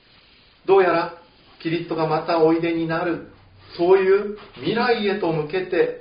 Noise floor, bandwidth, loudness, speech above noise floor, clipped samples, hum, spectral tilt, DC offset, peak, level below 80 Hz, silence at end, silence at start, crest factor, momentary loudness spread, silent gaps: -53 dBFS; 5.2 kHz; -21 LUFS; 33 dB; under 0.1%; none; -4.5 dB/octave; under 0.1%; -4 dBFS; -58 dBFS; 0 s; 0.65 s; 18 dB; 14 LU; none